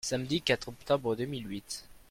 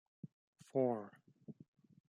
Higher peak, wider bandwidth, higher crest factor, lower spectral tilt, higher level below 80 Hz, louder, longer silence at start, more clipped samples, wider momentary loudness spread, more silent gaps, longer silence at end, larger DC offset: first, -12 dBFS vs -22 dBFS; first, 16.5 kHz vs 11 kHz; about the same, 20 dB vs 22 dB; second, -4 dB/octave vs -9 dB/octave; first, -58 dBFS vs under -90 dBFS; first, -33 LUFS vs -39 LUFS; second, 0.05 s vs 0.25 s; neither; second, 11 LU vs 23 LU; second, none vs 0.33-0.53 s; second, 0.1 s vs 0.6 s; neither